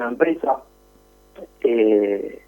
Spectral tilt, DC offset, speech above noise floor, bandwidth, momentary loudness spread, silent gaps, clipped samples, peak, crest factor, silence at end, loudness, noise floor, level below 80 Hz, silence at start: -7 dB/octave; under 0.1%; 34 dB; 17.5 kHz; 8 LU; none; under 0.1%; -4 dBFS; 18 dB; 0.1 s; -20 LUFS; -53 dBFS; -58 dBFS; 0 s